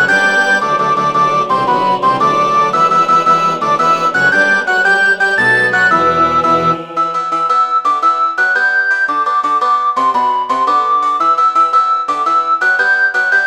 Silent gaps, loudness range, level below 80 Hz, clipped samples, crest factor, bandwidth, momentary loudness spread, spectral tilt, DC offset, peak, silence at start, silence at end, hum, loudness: none; 2 LU; -52 dBFS; under 0.1%; 12 dB; 15 kHz; 3 LU; -3.5 dB/octave; 0.2%; 0 dBFS; 0 s; 0 s; none; -11 LUFS